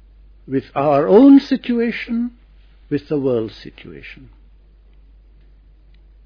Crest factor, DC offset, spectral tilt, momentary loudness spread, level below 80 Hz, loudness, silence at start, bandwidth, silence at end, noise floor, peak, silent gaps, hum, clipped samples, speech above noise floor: 18 dB; under 0.1%; -8.5 dB/octave; 27 LU; -46 dBFS; -16 LUFS; 0.5 s; 5.4 kHz; 2.1 s; -47 dBFS; 0 dBFS; none; none; under 0.1%; 31 dB